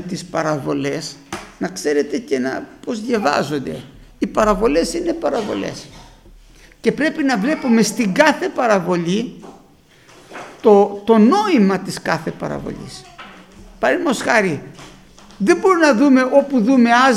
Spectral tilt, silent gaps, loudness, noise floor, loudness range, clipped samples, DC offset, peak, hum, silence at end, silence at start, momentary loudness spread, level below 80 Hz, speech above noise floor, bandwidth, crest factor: -5 dB/octave; none; -17 LUFS; -49 dBFS; 5 LU; under 0.1%; under 0.1%; 0 dBFS; none; 0 s; 0 s; 17 LU; -46 dBFS; 32 dB; 15 kHz; 18 dB